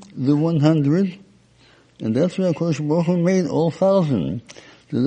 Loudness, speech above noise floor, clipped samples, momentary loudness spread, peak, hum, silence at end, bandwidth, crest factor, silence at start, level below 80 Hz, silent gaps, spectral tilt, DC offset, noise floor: -20 LUFS; 35 dB; under 0.1%; 9 LU; -2 dBFS; none; 0 s; 9 kHz; 18 dB; 0.15 s; -58 dBFS; none; -8 dB/octave; under 0.1%; -53 dBFS